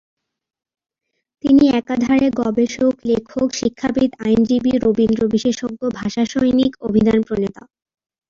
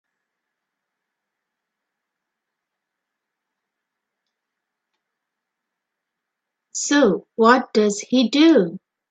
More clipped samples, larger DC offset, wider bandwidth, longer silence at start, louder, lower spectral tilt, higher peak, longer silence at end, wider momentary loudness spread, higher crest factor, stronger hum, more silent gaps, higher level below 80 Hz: neither; neither; second, 7.4 kHz vs 9.2 kHz; second, 1.45 s vs 6.75 s; about the same, -17 LUFS vs -17 LUFS; first, -6 dB/octave vs -4 dB/octave; second, -4 dBFS vs 0 dBFS; first, 0.8 s vs 0.35 s; second, 7 LU vs 11 LU; second, 14 dB vs 22 dB; neither; neither; first, -46 dBFS vs -70 dBFS